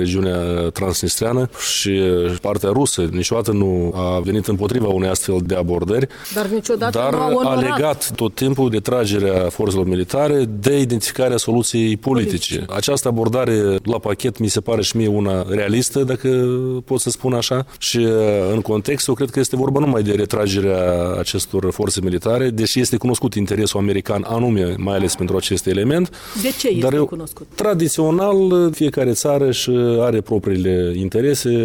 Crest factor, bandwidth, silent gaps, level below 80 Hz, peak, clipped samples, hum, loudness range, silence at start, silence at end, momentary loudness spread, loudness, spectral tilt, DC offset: 16 dB; 18 kHz; none; -42 dBFS; 0 dBFS; under 0.1%; none; 2 LU; 0 s; 0 s; 4 LU; -18 LUFS; -5 dB/octave; under 0.1%